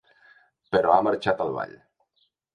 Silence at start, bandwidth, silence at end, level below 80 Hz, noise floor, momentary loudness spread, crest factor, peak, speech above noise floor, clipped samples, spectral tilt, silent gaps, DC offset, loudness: 0.7 s; 10.5 kHz; 0.8 s; -60 dBFS; -71 dBFS; 12 LU; 22 dB; -4 dBFS; 48 dB; under 0.1%; -6.5 dB/octave; none; under 0.1%; -24 LUFS